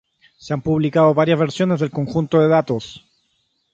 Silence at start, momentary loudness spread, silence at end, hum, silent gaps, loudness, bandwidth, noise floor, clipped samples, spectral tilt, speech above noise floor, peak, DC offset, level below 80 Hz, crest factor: 0.45 s; 11 LU; 0.75 s; none; none; -18 LUFS; 8 kHz; -67 dBFS; under 0.1%; -7.5 dB/octave; 50 dB; -2 dBFS; under 0.1%; -52 dBFS; 18 dB